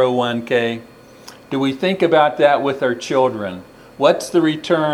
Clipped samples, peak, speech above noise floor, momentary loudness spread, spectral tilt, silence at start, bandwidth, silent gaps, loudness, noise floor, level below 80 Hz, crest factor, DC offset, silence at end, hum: under 0.1%; 0 dBFS; 25 dB; 12 LU; -5.5 dB/octave; 0 s; 14.5 kHz; none; -17 LUFS; -41 dBFS; -60 dBFS; 18 dB; under 0.1%; 0 s; none